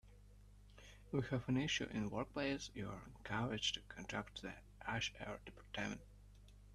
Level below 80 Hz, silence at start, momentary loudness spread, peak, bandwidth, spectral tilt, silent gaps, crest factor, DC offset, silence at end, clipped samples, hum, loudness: -62 dBFS; 0.05 s; 22 LU; -24 dBFS; 13 kHz; -4.5 dB/octave; none; 20 dB; under 0.1%; 0 s; under 0.1%; 50 Hz at -60 dBFS; -44 LUFS